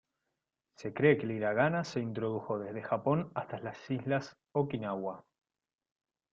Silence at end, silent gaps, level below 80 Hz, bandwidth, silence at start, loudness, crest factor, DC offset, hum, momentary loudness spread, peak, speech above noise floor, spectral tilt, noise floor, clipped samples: 1.15 s; none; -72 dBFS; 7.6 kHz; 0.8 s; -34 LUFS; 22 dB; under 0.1%; none; 13 LU; -12 dBFS; 54 dB; -7.5 dB/octave; -87 dBFS; under 0.1%